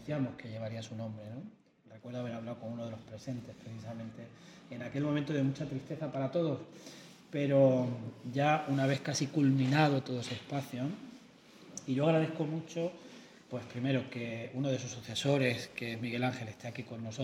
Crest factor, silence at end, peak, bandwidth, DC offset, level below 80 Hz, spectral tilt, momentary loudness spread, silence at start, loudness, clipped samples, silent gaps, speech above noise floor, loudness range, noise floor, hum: 22 dB; 0 s; -14 dBFS; 14.5 kHz; under 0.1%; -74 dBFS; -6 dB/octave; 18 LU; 0 s; -34 LUFS; under 0.1%; none; 23 dB; 12 LU; -57 dBFS; none